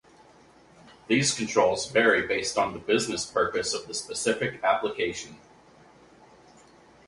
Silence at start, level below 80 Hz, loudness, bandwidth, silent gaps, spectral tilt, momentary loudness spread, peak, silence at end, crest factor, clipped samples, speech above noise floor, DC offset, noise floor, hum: 0.85 s; -60 dBFS; -26 LUFS; 11.5 kHz; none; -3 dB/octave; 9 LU; -6 dBFS; 1.7 s; 22 dB; under 0.1%; 29 dB; under 0.1%; -55 dBFS; none